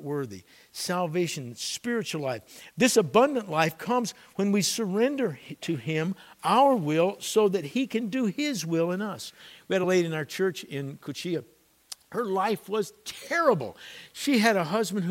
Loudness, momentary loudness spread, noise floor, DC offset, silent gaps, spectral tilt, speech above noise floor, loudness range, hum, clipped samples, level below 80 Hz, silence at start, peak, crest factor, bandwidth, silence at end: -27 LUFS; 14 LU; -48 dBFS; under 0.1%; none; -4.5 dB/octave; 21 dB; 4 LU; none; under 0.1%; -74 dBFS; 0 s; -6 dBFS; 20 dB; 16.5 kHz; 0 s